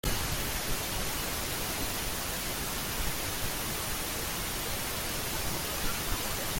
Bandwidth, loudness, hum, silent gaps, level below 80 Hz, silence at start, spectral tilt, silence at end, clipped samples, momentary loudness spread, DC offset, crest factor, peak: 17 kHz; -32 LUFS; none; none; -42 dBFS; 0.05 s; -2.5 dB/octave; 0 s; under 0.1%; 1 LU; under 0.1%; 16 dB; -16 dBFS